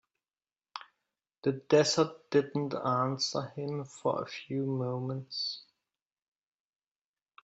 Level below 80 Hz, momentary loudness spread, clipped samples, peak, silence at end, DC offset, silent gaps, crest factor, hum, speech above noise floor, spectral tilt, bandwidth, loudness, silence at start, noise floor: -76 dBFS; 13 LU; under 0.1%; -12 dBFS; 1.85 s; under 0.1%; 1.38-1.42 s; 22 dB; none; over 59 dB; -4.5 dB/octave; 8 kHz; -32 LUFS; 0.75 s; under -90 dBFS